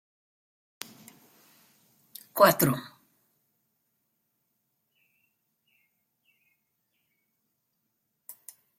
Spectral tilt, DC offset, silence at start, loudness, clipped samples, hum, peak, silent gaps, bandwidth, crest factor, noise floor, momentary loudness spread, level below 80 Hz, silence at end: -4.5 dB/octave; under 0.1%; 2.35 s; -24 LUFS; under 0.1%; none; -4 dBFS; none; 16.5 kHz; 30 dB; -79 dBFS; 28 LU; -74 dBFS; 0.45 s